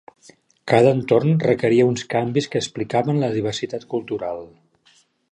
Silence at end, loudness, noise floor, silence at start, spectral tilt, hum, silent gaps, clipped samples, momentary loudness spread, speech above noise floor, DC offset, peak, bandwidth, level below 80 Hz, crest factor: 0.85 s; -20 LUFS; -58 dBFS; 0.65 s; -6.5 dB/octave; none; none; under 0.1%; 11 LU; 39 dB; under 0.1%; -2 dBFS; 10.5 kHz; -60 dBFS; 20 dB